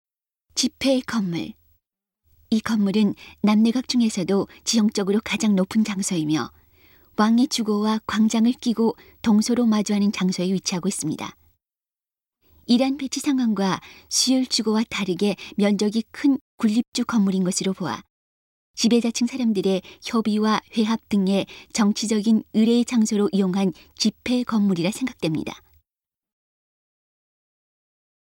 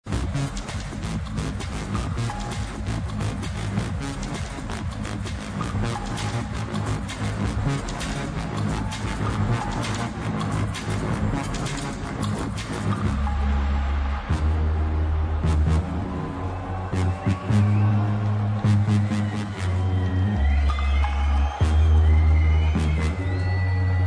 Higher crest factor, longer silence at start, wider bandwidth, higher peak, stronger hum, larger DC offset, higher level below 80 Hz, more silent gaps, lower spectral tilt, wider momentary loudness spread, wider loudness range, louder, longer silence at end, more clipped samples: about the same, 16 dB vs 14 dB; first, 0.55 s vs 0.05 s; first, 16.5 kHz vs 10.5 kHz; about the same, -6 dBFS vs -8 dBFS; neither; neither; second, -60 dBFS vs -28 dBFS; first, 16.41-16.58 s, 16.88-16.92 s, 18.10-18.74 s vs none; second, -4.5 dB/octave vs -6.5 dB/octave; about the same, 7 LU vs 9 LU; second, 4 LU vs 7 LU; first, -22 LUFS vs -25 LUFS; first, 2.8 s vs 0 s; neither